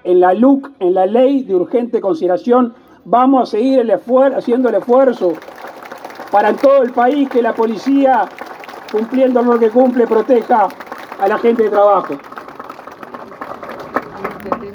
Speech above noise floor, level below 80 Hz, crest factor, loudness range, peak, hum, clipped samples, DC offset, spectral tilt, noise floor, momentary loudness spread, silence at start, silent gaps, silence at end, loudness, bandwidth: 20 dB; -62 dBFS; 14 dB; 3 LU; 0 dBFS; none; under 0.1%; under 0.1%; -7 dB/octave; -32 dBFS; 20 LU; 0.05 s; none; 0 s; -13 LUFS; 19 kHz